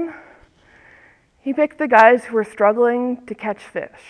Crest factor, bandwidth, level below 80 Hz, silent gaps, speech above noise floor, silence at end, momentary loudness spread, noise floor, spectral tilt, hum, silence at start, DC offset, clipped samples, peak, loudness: 20 dB; 10.5 kHz; -62 dBFS; none; 35 dB; 0.25 s; 17 LU; -52 dBFS; -5.5 dB/octave; none; 0 s; under 0.1%; under 0.1%; 0 dBFS; -17 LUFS